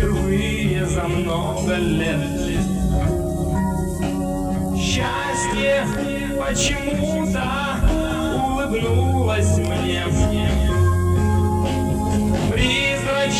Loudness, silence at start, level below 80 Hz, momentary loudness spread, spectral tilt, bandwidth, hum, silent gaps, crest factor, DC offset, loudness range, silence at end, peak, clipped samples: -20 LUFS; 0 s; -28 dBFS; 4 LU; -5.5 dB/octave; 14 kHz; none; none; 14 dB; under 0.1%; 2 LU; 0 s; -4 dBFS; under 0.1%